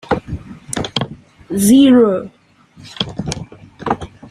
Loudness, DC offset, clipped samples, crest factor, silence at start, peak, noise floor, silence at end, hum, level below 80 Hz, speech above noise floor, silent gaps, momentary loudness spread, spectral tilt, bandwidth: -15 LUFS; under 0.1%; under 0.1%; 16 dB; 0.1 s; 0 dBFS; -33 dBFS; 0.25 s; none; -42 dBFS; 21 dB; none; 21 LU; -5 dB/octave; 14.5 kHz